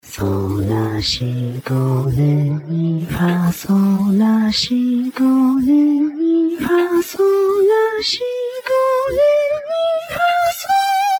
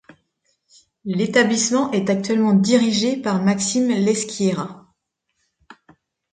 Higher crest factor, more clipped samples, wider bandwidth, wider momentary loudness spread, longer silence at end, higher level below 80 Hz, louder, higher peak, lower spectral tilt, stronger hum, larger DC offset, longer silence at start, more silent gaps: second, 10 dB vs 18 dB; neither; first, over 20 kHz vs 9.4 kHz; about the same, 6 LU vs 8 LU; second, 0 s vs 1.55 s; first, -44 dBFS vs -64 dBFS; first, -16 LUFS vs -19 LUFS; about the same, -6 dBFS vs -4 dBFS; first, -6.5 dB/octave vs -4.5 dB/octave; neither; neither; second, 0.05 s vs 1.05 s; neither